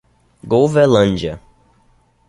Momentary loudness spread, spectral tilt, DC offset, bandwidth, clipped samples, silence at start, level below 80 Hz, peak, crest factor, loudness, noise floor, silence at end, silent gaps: 14 LU; -6.5 dB/octave; under 0.1%; 11.5 kHz; under 0.1%; 0.45 s; -42 dBFS; -2 dBFS; 16 dB; -15 LUFS; -55 dBFS; 0.9 s; none